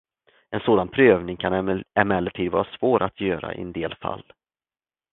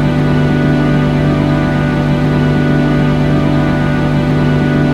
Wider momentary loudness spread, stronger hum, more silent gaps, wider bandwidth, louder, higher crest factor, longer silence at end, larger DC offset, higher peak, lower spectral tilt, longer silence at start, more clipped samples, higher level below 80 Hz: first, 14 LU vs 1 LU; neither; neither; second, 4.1 kHz vs 7.8 kHz; second, -23 LUFS vs -12 LUFS; first, 24 dB vs 12 dB; first, 0.9 s vs 0 s; neither; about the same, 0 dBFS vs 0 dBFS; first, -11 dB/octave vs -8 dB/octave; first, 0.5 s vs 0 s; neither; second, -50 dBFS vs -26 dBFS